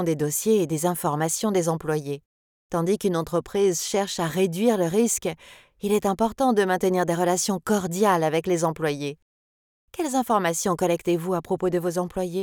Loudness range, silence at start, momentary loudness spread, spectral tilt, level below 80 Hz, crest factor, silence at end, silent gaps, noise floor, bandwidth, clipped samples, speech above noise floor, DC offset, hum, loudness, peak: 3 LU; 0 s; 6 LU; -5 dB/octave; -56 dBFS; 16 dB; 0 s; 2.26-2.70 s, 9.22-9.88 s; under -90 dBFS; over 20 kHz; under 0.1%; over 67 dB; under 0.1%; none; -24 LUFS; -8 dBFS